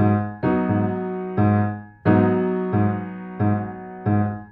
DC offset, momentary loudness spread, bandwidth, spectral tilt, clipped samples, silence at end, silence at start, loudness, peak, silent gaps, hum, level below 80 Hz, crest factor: under 0.1%; 9 LU; 4.1 kHz; -12.5 dB/octave; under 0.1%; 0.05 s; 0 s; -22 LUFS; -2 dBFS; none; none; -52 dBFS; 18 dB